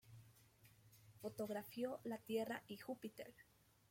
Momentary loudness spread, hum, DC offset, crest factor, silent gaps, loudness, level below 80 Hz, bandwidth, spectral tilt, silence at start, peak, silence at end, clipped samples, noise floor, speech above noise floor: 24 LU; none; under 0.1%; 18 dB; none; -49 LUFS; -84 dBFS; 16.5 kHz; -5 dB/octave; 0.05 s; -32 dBFS; 0.5 s; under 0.1%; -70 dBFS; 22 dB